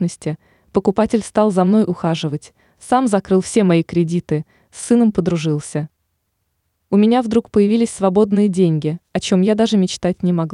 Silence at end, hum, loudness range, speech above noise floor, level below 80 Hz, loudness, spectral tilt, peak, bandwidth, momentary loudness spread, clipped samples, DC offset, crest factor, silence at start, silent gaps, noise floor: 0 s; none; 3 LU; 54 dB; -50 dBFS; -17 LUFS; -6.5 dB/octave; -4 dBFS; 11 kHz; 10 LU; under 0.1%; under 0.1%; 14 dB; 0 s; none; -70 dBFS